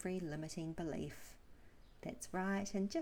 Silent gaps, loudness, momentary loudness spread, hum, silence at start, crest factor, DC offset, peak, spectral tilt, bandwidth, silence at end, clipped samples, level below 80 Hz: none; -43 LUFS; 12 LU; none; 0 s; 16 dB; under 0.1%; -28 dBFS; -5.5 dB/octave; 17.5 kHz; 0 s; under 0.1%; -62 dBFS